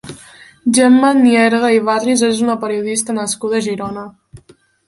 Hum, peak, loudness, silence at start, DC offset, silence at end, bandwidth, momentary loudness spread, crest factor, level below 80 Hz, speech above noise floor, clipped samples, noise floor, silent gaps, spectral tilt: none; 0 dBFS; -14 LUFS; 0.05 s; under 0.1%; 0.5 s; 11.5 kHz; 14 LU; 14 dB; -56 dBFS; 35 dB; under 0.1%; -48 dBFS; none; -3.5 dB/octave